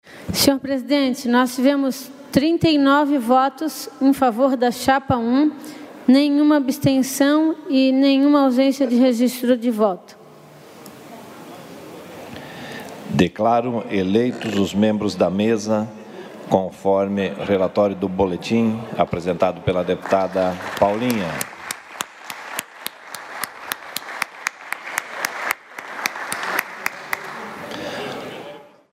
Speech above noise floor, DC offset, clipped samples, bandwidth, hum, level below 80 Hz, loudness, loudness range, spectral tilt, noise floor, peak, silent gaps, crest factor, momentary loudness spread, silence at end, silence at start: 26 dB; under 0.1%; under 0.1%; 16 kHz; none; -54 dBFS; -20 LUFS; 10 LU; -5 dB/octave; -44 dBFS; 0 dBFS; none; 20 dB; 17 LU; 0.3 s; 0.05 s